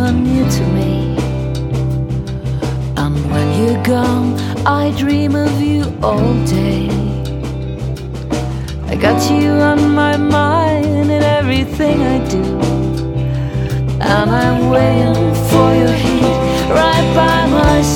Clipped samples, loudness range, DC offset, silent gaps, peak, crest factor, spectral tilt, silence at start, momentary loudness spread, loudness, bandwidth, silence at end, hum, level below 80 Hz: under 0.1%; 5 LU; under 0.1%; none; 0 dBFS; 14 dB; -6.5 dB/octave; 0 s; 8 LU; -14 LUFS; 17.5 kHz; 0 s; none; -26 dBFS